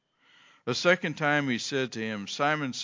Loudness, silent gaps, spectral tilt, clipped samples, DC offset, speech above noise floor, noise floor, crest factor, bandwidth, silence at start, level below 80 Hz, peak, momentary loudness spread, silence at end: -28 LUFS; none; -4 dB/octave; under 0.1%; under 0.1%; 33 dB; -61 dBFS; 22 dB; 7.6 kHz; 0.65 s; -74 dBFS; -8 dBFS; 9 LU; 0 s